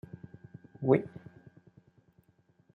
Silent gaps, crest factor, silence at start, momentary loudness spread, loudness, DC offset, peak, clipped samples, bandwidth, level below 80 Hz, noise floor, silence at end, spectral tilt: none; 26 dB; 0.8 s; 25 LU; -29 LUFS; under 0.1%; -10 dBFS; under 0.1%; 4.1 kHz; -72 dBFS; -68 dBFS; 1.55 s; -11 dB/octave